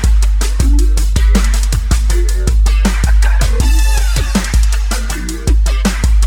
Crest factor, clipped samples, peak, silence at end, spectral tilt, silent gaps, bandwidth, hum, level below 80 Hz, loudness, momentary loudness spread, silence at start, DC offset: 10 dB; under 0.1%; 0 dBFS; 0 s; -4.5 dB/octave; none; 15.5 kHz; none; -10 dBFS; -14 LUFS; 3 LU; 0 s; under 0.1%